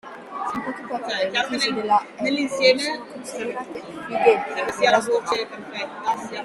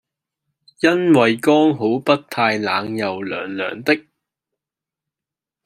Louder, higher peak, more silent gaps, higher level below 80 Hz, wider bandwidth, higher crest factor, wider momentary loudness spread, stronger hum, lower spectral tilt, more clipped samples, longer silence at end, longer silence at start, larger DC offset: second, -23 LUFS vs -18 LUFS; about the same, -4 dBFS vs -2 dBFS; neither; about the same, -66 dBFS vs -66 dBFS; second, 13 kHz vs 15 kHz; about the same, 20 dB vs 18 dB; first, 13 LU vs 10 LU; neither; second, -3 dB/octave vs -5.5 dB/octave; neither; second, 0 s vs 1.65 s; second, 0.05 s vs 0.8 s; neither